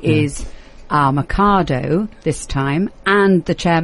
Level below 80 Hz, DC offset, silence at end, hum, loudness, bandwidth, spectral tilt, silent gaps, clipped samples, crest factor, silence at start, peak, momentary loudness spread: -32 dBFS; under 0.1%; 0 s; none; -17 LUFS; 11.5 kHz; -6 dB/octave; none; under 0.1%; 14 dB; 0 s; -2 dBFS; 8 LU